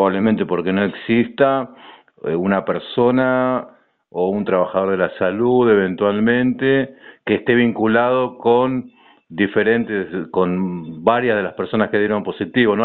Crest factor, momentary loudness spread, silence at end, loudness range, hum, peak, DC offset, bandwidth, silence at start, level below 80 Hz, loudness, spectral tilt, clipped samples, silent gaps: 16 dB; 7 LU; 0 s; 3 LU; none; -2 dBFS; under 0.1%; 4.3 kHz; 0 s; -56 dBFS; -18 LUFS; -5 dB/octave; under 0.1%; none